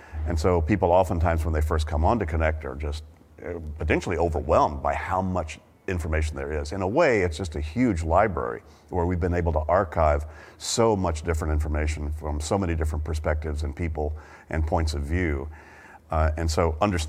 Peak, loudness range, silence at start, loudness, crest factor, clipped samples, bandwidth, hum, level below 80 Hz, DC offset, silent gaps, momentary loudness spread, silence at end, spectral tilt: -6 dBFS; 4 LU; 0 s; -25 LUFS; 20 dB; under 0.1%; 13 kHz; none; -32 dBFS; under 0.1%; none; 11 LU; 0 s; -6 dB/octave